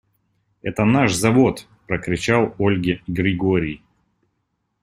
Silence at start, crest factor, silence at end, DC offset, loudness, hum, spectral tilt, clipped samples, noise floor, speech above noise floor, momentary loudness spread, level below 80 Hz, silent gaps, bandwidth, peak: 0.65 s; 18 dB; 1.05 s; under 0.1%; -19 LUFS; none; -6 dB/octave; under 0.1%; -72 dBFS; 54 dB; 12 LU; -48 dBFS; none; 15 kHz; -2 dBFS